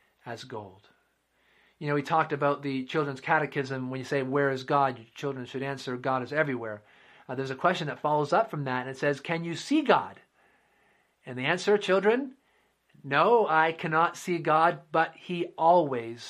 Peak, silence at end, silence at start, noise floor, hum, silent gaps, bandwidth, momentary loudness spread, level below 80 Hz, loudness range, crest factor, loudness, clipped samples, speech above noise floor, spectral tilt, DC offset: -8 dBFS; 0 s; 0.25 s; -71 dBFS; none; none; 13 kHz; 14 LU; -76 dBFS; 5 LU; 22 dB; -27 LUFS; under 0.1%; 43 dB; -5.5 dB/octave; under 0.1%